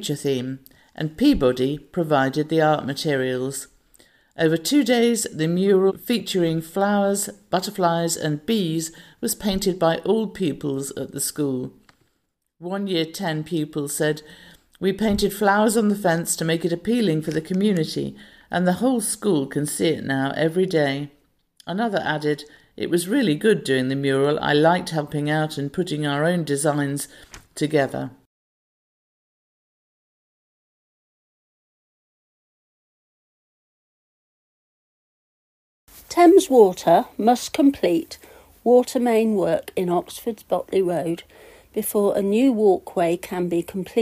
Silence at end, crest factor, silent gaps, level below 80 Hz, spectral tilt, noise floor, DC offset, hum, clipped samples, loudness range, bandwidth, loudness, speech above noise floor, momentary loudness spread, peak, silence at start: 0 s; 20 dB; 28.26-35.87 s; -52 dBFS; -5 dB/octave; -73 dBFS; under 0.1%; none; under 0.1%; 7 LU; 15.5 kHz; -21 LUFS; 53 dB; 11 LU; -2 dBFS; 0 s